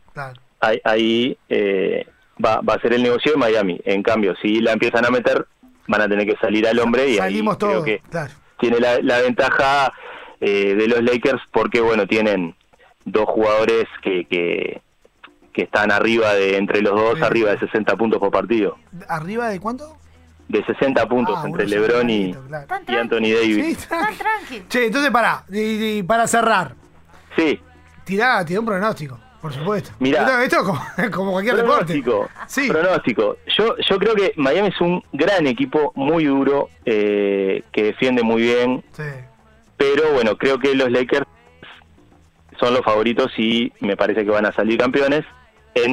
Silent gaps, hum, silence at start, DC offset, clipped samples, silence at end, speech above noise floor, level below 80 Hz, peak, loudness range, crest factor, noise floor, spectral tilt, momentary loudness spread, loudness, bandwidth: none; none; 0.15 s; under 0.1%; under 0.1%; 0 s; 33 dB; -50 dBFS; -2 dBFS; 3 LU; 16 dB; -51 dBFS; -5 dB/octave; 9 LU; -18 LUFS; 15.5 kHz